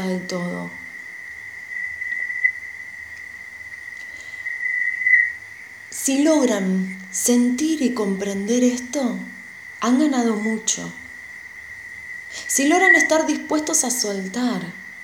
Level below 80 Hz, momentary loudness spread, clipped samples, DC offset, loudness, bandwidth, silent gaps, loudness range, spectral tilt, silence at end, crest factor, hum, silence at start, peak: -62 dBFS; 19 LU; under 0.1%; under 0.1%; -20 LUFS; 19 kHz; none; 8 LU; -3 dB/octave; 0 s; 20 dB; none; 0 s; -2 dBFS